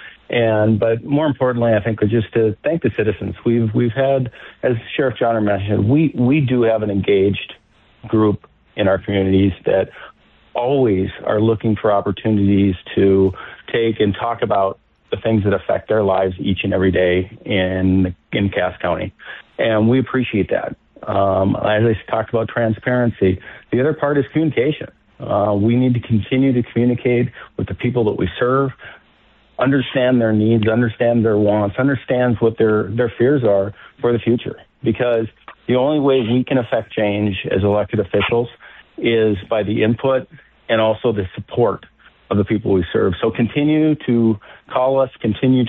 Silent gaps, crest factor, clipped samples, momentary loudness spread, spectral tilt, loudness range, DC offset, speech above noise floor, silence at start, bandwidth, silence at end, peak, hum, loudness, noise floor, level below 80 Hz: none; 12 dB; under 0.1%; 7 LU; -11 dB/octave; 2 LU; under 0.1%; 37 dB; 0 s; 4.1 kHz; 0 s; -6 dBFS; none; -18 LUFS; -53 dBFS; -46 dBFS